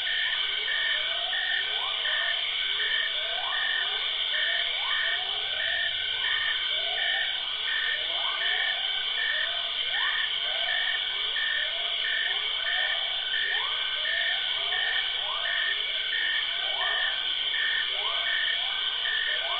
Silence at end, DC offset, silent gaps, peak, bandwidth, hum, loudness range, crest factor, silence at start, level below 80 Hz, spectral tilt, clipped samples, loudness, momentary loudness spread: 0 s; under 0.1%; none; -14 dBFS; 5.8 kHz; none; 0 LU; 14 dB; 0 s; -62 dBFS; -2 dB/octave; under 0.1%; -26 LUFS; 2 LU